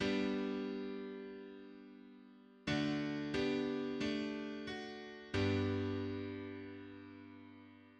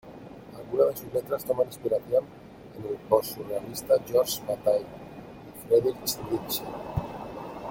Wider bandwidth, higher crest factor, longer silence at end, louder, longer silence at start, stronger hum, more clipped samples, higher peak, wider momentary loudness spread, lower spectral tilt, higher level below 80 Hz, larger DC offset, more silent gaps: second, 9.2 kHz vs 17 kHz; about the same, 18 dB vs 22 dB; about the same, 0 s vs 0 s; second, -40 LUFS vs -28 LUFS; about the same, 0 s vs 0.05 s; neither; neither; second, -24 dBFS vs -6 dBFS; about the same, 20 LU vs 20 LU; first, -6.5 dB/octave vs -4.5 dB/octave; second, -66 dBFS vs -56 dBFS; neither; neither